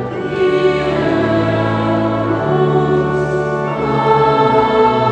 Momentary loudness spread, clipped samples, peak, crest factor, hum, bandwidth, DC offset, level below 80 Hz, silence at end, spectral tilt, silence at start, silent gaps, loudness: 5 LU; under 0.1%; 0 dBFS; 14 dB; none; 8.8 kHz; under 0.1%; -40 dBFS; 0 s; -7.5 dB/octave; 0 s; none; -14 LUFS